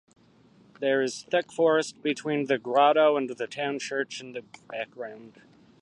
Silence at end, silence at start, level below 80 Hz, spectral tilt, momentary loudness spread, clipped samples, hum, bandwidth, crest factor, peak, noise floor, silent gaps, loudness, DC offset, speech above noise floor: 0.55 s; 0.8 s; -78 dBFS; -4 dB/octave; 17 LU; under 0.1%; none; 11.5 kHz; 20 dB; -8 dBFS; -58 dBFS; none; -26 LUFS; under 0.1%; 32 dB